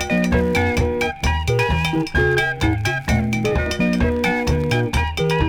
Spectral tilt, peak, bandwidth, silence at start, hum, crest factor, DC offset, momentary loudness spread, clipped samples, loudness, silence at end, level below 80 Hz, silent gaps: -6 dB/octave; -6 dBFS; 18.5 kHz; 0 s; none; 12 dB; under 0.1%; 3 LU; under 0.1%; -19 LUFS; 0 s; -28 dBFS; none